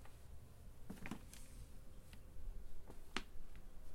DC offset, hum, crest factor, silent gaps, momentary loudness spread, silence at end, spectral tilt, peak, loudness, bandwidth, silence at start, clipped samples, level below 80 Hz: under 0.1%; none; 28 dB; none; 12 LU; 0 s; -4 dB/octave; -20 dBFS; -56 LUFS; 16 kHz; 0 s; under 0.1%; -54 dBFS